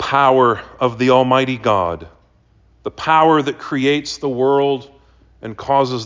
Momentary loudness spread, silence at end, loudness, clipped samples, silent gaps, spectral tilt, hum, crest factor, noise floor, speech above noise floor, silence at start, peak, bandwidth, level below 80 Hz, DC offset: 17 LU; 0 s; -16 LUFS; under 0.1%; none; -5.5 dB/octave; none; 16 dB; -53 dBFS; 38 dB; 0 s; -2 dBFS; 7.6 kHz; -48 dBFS; under 0.1%